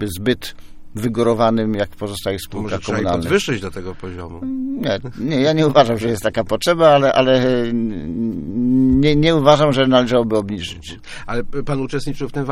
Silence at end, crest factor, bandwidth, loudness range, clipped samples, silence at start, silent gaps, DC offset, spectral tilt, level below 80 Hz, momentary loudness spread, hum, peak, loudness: 0 s; 18 dB; 16 kHz; 6 LU; under 0.1%; 0 s; none; under 0.1%; -6 dB/octave; -38 dBFS; 13 LU; none; 0 dBFS; -17 LUFS